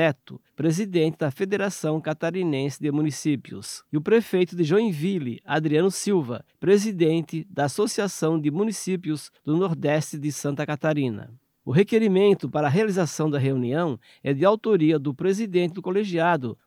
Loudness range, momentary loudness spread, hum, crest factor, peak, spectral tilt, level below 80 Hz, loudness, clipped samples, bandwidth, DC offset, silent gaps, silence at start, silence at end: 3 LU; 8 LU; none; 16 dB; -6 dBFS; -6 dB/octave; -74 dBFS; -24 LUFS; under 0.1%; 16 kHz; under 0.1%; none; 0 s; 0.15 s